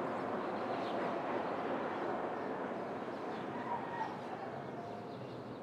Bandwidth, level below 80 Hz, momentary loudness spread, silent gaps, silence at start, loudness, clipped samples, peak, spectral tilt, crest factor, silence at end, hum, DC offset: 13 kHz; -80 dBFS; 7 LU; none; 0 s; -40 LUFS; under 0.1%; -24 dBFS; -6.5 dB/octave; 16 dB; 0 s; none; under 0.1%